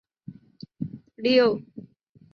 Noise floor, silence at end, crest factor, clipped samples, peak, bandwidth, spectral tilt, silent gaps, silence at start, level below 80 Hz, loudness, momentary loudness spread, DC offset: -53 dBFS; 0.55 s; 18 dB; under 0.1%; -8 dBFS; 6.6 kHz; -7 dB/octave; none; 0.3 s; -70 dBFS; -24 LUFS; 26 LU; under 0.1%